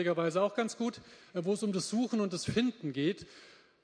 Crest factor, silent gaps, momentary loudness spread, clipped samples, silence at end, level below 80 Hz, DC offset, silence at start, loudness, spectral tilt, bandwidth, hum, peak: 16 dB; none; 10 LU; under 0.1%; 0.3 s; -66 dBFS; under 0.1%; 0 s; -33 LUFS; -5 dB/octave; 10.5 kHz; none; -18 dBFS